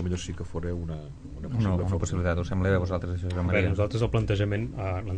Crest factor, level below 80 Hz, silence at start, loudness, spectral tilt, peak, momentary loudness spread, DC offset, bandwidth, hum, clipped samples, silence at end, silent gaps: 18 dB; -40 dBFS; 0 s; -28 LUFS; -7 dB/octave; -10 dBFS; 9 LU; under 0.1%; 9.2 kHz; none; under 0.1%; 0 s; none